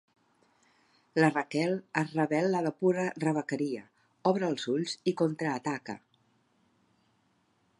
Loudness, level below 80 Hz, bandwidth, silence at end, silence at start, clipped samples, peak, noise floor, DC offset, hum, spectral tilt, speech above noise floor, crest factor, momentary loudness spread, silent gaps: -30 LUFS; -80 dBFS; 11 kHz; 1.8 s; 1.15 s; under 0.1%; -10 dBFS; -71 dBFS; under 0.1%; none; -6 dB/octave; 42 dB; 22 dB; 8 LU; none